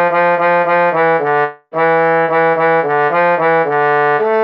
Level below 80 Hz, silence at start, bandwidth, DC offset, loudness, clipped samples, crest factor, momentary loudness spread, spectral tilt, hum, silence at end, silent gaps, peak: -78 dBFS; 0 s; 5.6 kHz; under 0.1%; -13 LUFS; under 0.1%; 8 dB; 2 LU; -8 dB/octave; none; 0 s; none; -4 dBFS